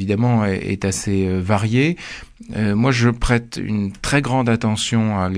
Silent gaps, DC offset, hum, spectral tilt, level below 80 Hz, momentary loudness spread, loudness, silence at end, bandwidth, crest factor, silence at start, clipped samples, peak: none; under 0.1%; none; -5.5 dB/octave; -34 dBFS; 7 LU; -19 LUFS; 0 s; 11 kHz; 16 dB; 0 s; under 0.1%; -2 dBFS